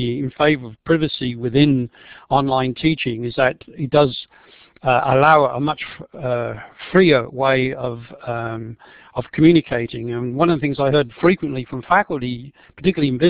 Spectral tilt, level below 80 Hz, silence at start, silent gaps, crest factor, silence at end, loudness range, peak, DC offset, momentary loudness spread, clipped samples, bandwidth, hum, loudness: -10.5 dB/octave; -48 dBFS; 0 s; none; 18 dB; 0 s; 3 LU; 0 dBFS; 0.1%; 15 LU; under 0.1%; 5 kHz; none; -19 LUFS